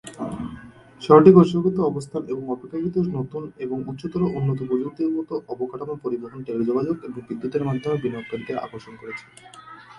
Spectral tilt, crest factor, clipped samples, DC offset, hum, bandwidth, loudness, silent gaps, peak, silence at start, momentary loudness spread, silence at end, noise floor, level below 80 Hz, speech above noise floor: -8.5 dB/octave; 22 dB; under 0.1%; under 0.1%; none; 11 kHz; -22 LUFS; none; 0 dBFS; 0.05 s; 20 LU; 0 s; -43 dBFS; -56 dBFS; 21 dB